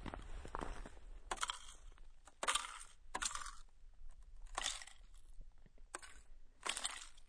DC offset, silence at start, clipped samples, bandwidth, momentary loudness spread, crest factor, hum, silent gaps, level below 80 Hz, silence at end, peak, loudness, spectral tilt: under 0.1%; 0 s; under 0.1%; 10.5 kHz; 24 LU; 28 dB; none; none; -56 dBFS; 0 s; -20 dBFS; -45 LUFS; -0.5 dB/octave